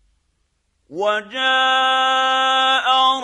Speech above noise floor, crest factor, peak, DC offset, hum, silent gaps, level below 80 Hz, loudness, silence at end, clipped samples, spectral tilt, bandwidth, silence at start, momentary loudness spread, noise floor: 50 dB; 12 dB; -6 dBFS; under 0.1%; none; none; -66 dBFS; -16 LUFS; 0 s; under 0.1%; -0.5 dB/octave; 11 kHz; 0.9 s; 6 LU; -67 dBFS